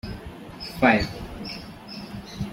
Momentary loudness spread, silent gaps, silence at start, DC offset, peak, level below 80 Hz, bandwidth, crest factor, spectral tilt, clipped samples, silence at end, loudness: 19 LU; none; 0.05 s; under 0.1%; -4 dBFS; -44 dBFS; 16.5 kHz; 24 dB; -6 dB/octave; under 0.1%; 0 s; -24 LUFS